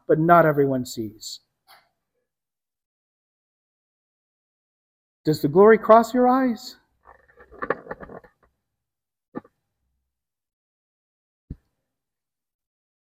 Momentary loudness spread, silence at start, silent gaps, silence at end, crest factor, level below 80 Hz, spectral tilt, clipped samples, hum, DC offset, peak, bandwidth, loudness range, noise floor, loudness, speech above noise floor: 25 LU; 0.1 s; 2.86-5.24 s, 9.28-9.32 s, 10.53-11.48 s; 1.65 s; 24 dB; -60 dBFS; -6.5 dB/octave; under 0.1%; none; under 0.1%; 0 dBFS; 16 kHz; 18 LU; under -90 dBFS; -19 LUFS; over 72 dB